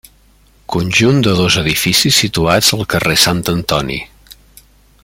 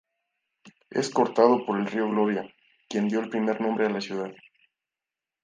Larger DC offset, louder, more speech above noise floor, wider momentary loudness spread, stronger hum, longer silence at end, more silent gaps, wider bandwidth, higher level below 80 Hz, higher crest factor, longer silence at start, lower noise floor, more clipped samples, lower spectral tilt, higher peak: neither; first, -12 LUFS vs -26 LUFS; second, 36 dB vs 65 dB; about the same, 10 LU vs 12 LU; first, 50 Hz at -40 dBFS vs none; second, 0.7 s vs 1.1 s; neither; first, 17 kHz vs 9.6 kHz; first, -38 dBFS vs -76 dBFS; second, 14 dB vs 24 dB; about the same, 0.7 s vs 0.65 s; second, -49 dBFS vs -90 dBFS; neither; second, -3.5 dB/octave vs -5.5 dB/octave; first, 0 dBFS vs -4 dBFS